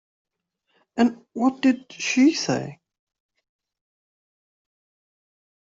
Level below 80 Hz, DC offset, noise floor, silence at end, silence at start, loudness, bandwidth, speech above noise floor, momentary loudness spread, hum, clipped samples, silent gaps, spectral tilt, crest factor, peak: -70 dBFS; under 0.1%; -75 dBFS; 2.85 s; 0.95 s; -22 LUFS; 7.8 kHz; 53 dB; 9 LU; none; under 0.1%; none; -4 dB/octave; 20 dB; -6 dBFS